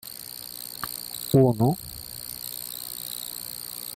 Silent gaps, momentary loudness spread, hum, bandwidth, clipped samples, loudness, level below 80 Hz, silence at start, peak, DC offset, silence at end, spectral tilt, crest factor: none; 15 LU; none; 17 kHz; under 0.1%; -28 LUFS; -56 dBFS; 0.05 s; -8 dBFS; under 0.1%; 0 s; -5.5 dB/octave; 20 dB